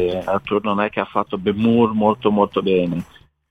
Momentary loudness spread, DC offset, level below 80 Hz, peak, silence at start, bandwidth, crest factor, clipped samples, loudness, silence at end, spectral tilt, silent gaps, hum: 7 LU; under 0.1%; -50 dBFS; -2 dBFS; 0 s; 6.4 kHz; 18 dB; under 0.1%; -19 LUFS; 0.45 s; -8.5 dB/octave; none; none